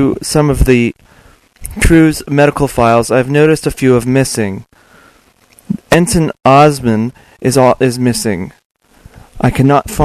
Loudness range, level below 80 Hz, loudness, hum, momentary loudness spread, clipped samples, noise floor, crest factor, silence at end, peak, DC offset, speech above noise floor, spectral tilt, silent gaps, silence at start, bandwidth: 3 LU; -26 dBFS; -11 LUFS; none; 12 LU; 0.3%; -48 dBFS; 12 dB; 0 s; 0 dBFS; under 0.1%; 37 dB; -6 dB/octave; 8.65-8.75 s; 0 s; 14 kHz